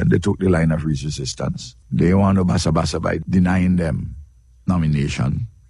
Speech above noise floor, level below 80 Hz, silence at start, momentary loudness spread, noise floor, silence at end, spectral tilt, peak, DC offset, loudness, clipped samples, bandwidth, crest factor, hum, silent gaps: 25 dB; -36 dBFS; 0 s; 10 LU; -43 dBFS; 0.2 s; -6.5 dB/octave; -4 dBFS; under 0.1%; -19 LUFS; under 0.1%; 11.5 kHz; 16 dB; none; none